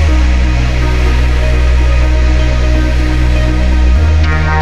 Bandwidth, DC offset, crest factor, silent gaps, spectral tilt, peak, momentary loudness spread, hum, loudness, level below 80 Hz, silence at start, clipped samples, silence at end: 7.8 kHz; under 0.1%; 8 dB; none; -6.5 dB/octave; 0 dBFS; 2 LU; none; -12 LUFS; -10 dBFS; 0 s; under 0.1%; 0 s